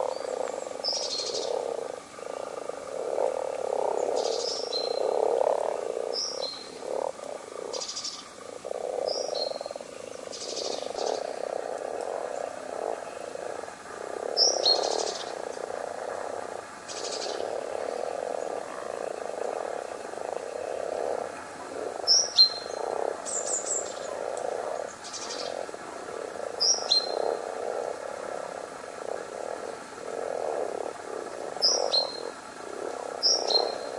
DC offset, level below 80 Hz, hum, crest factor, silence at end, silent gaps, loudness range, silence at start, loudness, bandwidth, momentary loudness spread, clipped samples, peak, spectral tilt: under 0.1%; -74 dBFS; none; 22 dB; 0 s; none; 9 LU; 0 s; -29 LUFS; 11.5 kHz; 15 LU; under 0.1%; -8 dBFS; -0.5 dB/octave